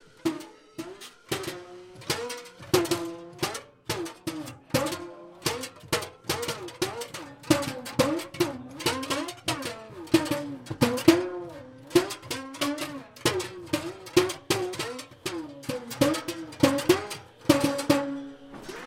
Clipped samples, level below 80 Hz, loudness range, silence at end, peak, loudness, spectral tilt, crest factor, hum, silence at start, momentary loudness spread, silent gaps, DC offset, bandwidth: under 0.1%; -58 dBFS; 5 LU; 0 s; -4 dBFS; -29 LUFS; -4 dB/octave; 26 dB; none; 0.25 s; 15 LU; none; under 0.1%; 17 kHz